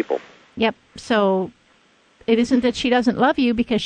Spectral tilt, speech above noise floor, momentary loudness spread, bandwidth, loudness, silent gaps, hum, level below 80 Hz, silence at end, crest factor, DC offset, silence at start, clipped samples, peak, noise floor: -5.5 dB/octave; 38 dB; 14 LU; 9.6 kHz; -20 LUFS; none; none; -50 dBFS; 0 s; 16 dB; under 0.1%; 0 s; under 0.1%; -4 dBFS; -57 dBFS